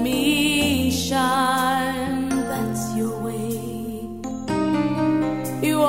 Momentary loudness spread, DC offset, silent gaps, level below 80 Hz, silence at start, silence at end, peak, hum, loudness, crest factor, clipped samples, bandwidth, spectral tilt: 11 LU; 0.4%; none; -48 dBFS; 0 s; 0 s; -6 dBFS; none; -22 LUFS; 16 dB; under 0.1%; 16.5 kHz; -4.5 dB/octave